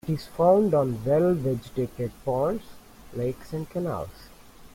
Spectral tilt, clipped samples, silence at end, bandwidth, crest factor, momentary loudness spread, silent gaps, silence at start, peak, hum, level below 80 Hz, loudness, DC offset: -8.5 dB/octave; under 0.1%; 0.05 s; 16.5 kHz; 18 dB; 14 LU; none; 0.05 s; -8 dBFS; none; -50 dBFS; -26 LUFS; under 0.1%